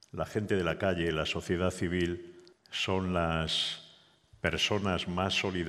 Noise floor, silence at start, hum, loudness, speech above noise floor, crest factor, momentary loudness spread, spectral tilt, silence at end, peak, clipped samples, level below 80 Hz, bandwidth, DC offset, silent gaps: -61 dBFS; 0.15 s; none; -31 LUFS; 30 dB; 20 dB; 6 LU; -4.5 dB/octave; 0 s; -12 dBFS; under 0.1%; -56 dBFS; 14 kHz; under 0.1%; none